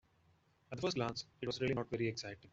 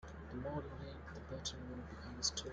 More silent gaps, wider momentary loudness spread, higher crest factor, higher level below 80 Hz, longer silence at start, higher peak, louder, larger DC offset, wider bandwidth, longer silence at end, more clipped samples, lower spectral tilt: neither; second, 7 LU vs 11 LU; second, 20 dB vs 26 dB; second, -70 dBFS vs -56 dBFS; first, 0.7 s vs 0 s; about the same, -22 dBFS vs -20 dBFS; first, -40 LUFS vs -45 LUFS; neither; second, 8 kHz vs 10 kHz; about the same, 0.05 s vs 0 s; neither; first, -5 dB/octave vs -3 dB/octave